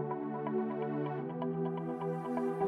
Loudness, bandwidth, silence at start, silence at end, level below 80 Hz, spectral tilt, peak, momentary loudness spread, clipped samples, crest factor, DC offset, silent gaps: -37 LUFS; 9.8 kHz; 0 s; 0 s; -78 dBFS; -9.5 dB/octave; -22 dBFS; 2 LU; under 0.1%; 14 dB; under 0.1%; none